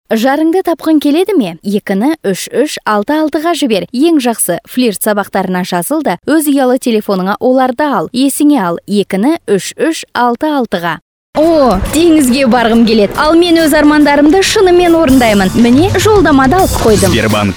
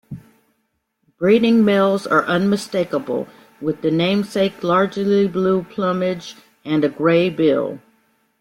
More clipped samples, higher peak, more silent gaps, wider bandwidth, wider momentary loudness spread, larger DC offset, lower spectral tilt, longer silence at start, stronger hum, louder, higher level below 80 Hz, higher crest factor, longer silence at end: neither; first, 0 dBFS vs -4 dBFS; first, 11.02-11.33 s vs none; first, over 20 kHz vs 15.5 kHz; second, 7 LU vs 13 LU; neither; second, -5 dB/octave vs -6.5 dB/octave; about the same, 0.1 s vs 0.1 s; neither; first, -10 LUFS vs -18 LUFS; first, -30 dBFS vs -60 dBFS; second, 10 dB vs 16 dB; second, 0 s vs 0.65 s